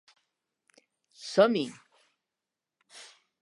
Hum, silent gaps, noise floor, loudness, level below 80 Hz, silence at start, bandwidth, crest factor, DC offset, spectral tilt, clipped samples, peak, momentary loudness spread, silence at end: none; none; -89 dBFS; -27 LUFS; -88 dBFS; 1.2 s; 11.5 kHz; 24 dB; under 0.1%; -5 dB/octave; under 0.1%; -8 dBFS; 25 LU; 0.4 s